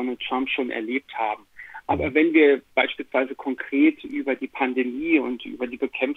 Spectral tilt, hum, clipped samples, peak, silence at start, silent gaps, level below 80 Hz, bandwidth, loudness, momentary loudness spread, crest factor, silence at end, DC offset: -7 dB/octave; none; under 0.1%; -4 dBFS; 0 s; none; -54 dBFS; 4.1 kHz; -23 LUFS; 12 LU; 20 dB; 0 s; under 0.1%